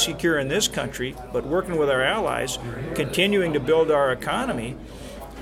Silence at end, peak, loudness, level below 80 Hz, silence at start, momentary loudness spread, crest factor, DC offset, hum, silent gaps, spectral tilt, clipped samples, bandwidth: 0 s; -6 dBFS; -23 LUFS; -44 dBFS; 0 s; 11 LU; 18 dB; under 0.1%; none; none; -4 dB/octave; under 0.1%; 16.5 kHz